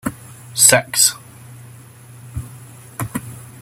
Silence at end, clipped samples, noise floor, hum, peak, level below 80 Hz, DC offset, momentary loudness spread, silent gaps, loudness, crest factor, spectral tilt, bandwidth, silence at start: 0.15 s; under 0.1%; -41 dBFS; none; 0 dBFS; -48 dBFS; under 0.1%; 25 LU; none; -14 LUFS; 20 dB; -1.5 dB/octave; 16.5 kHz; 0.05 s